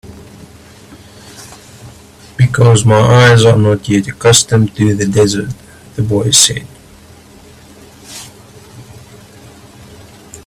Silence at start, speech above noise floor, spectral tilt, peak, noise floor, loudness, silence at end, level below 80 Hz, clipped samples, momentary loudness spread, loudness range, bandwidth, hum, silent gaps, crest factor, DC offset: 0.05 s; 30 dB; -4.5 dB/octave; 0 dBFS; -39 dBFS; -10 LUFS; 0.1 s; -42 dBFS; under 0.1%; 24 LU; 6 LU; 15.5 kHz; none; none; 14 dB; under 0.1%